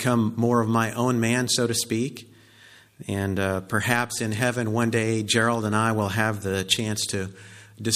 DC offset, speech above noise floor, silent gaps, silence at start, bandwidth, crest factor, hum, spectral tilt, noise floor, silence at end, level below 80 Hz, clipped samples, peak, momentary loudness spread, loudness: under 0.1%; 28 dB; none; 0 s; 15.5 kHz; 22 dB; none; -4.5 dB/octave; -52 dBFS; 0 s; -60 dBFS; under 0.1%; -4 dBFS; 8 LU; -24 LUFS